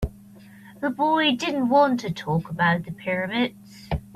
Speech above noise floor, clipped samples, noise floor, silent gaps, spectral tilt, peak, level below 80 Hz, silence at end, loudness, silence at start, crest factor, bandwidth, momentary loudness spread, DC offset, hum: 24 dB; under 0.1%; -47 dBFS; none; -6 dB/octave; -6 dBFS; -44 dBFS; 0.1 s; -23 LUFS; 0 s; 18 dB; 14.5 kHz; 11 LU; under 0.1%; none